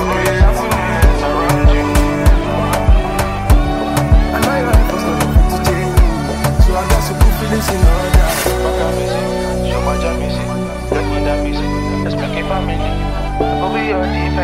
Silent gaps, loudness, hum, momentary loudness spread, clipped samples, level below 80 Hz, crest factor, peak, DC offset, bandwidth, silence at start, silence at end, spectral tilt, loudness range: none; -15 LUFS; none; 5 LU; under 0.1%; -16 dBFS; 12 dB; 0 dBFS; under 0.1%; 16 kHz; 0 s; 0 s; -6 dB/octave; 4 LU